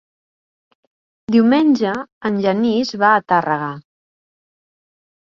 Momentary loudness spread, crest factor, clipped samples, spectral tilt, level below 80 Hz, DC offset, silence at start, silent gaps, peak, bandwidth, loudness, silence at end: 11 LU; 18 dB; under 0.1%; -6.5 dB/octave; -62 dBFS; under 0.1%; 1.3 s; 2.12-2.21 s; -2 dBFS; 7.2 kHz; -16 LUFS; 1.4 s